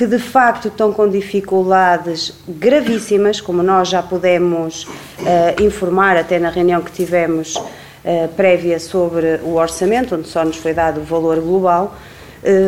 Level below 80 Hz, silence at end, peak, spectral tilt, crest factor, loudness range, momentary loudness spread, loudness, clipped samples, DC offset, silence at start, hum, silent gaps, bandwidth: -44 dBFS; 0 s; 0 dBFS; -5 dB/octave; 14 dB; 2 LU; 9 LU; -15 LUFS; under 0.1%; 0.2%; 0 s; none; none; 16.5 kHz